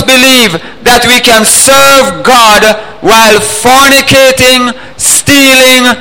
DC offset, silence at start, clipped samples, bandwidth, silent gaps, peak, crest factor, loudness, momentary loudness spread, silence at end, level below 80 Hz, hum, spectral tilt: 3%; 0 s; 7%; over 20 kHz; none; 0 dBFS; 4 dB; -3 LUFS; 6 LU; 0 s; -32 dBFS; none; -1.5 dB/octave